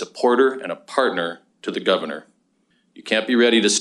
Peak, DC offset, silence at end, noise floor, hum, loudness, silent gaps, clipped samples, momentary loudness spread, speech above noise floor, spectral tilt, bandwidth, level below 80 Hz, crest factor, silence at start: -2 dBFS; under 0.1%; 0 s; -65 dBFS; none; -20 LUFS; none; under 0.1%; 16 LU; 45 dB; -2.5 dB/octave; 11.5 kHz; -74 dBFS; 20 dB; 0 s